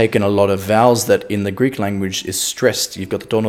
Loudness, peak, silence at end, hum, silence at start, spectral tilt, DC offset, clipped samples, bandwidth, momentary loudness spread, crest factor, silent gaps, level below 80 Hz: -17 LUFS; 0 dBFS; 0 s; none; 0 s; -4.5 dB/octave; under 0.1%; under 0.1%; 18 kHz; 8 LU; 16 dB; none; -56 dBFS